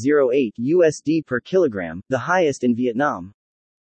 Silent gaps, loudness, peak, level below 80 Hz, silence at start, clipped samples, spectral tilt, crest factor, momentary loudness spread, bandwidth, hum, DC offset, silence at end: none; -20 LUFS; -6 dBFS; -64 dBFS; 0 s; under 0.1%; -6 dB/octave; 14 dB; 8 LU; 8.8 kHz; none; under 0.1%; 0.6 s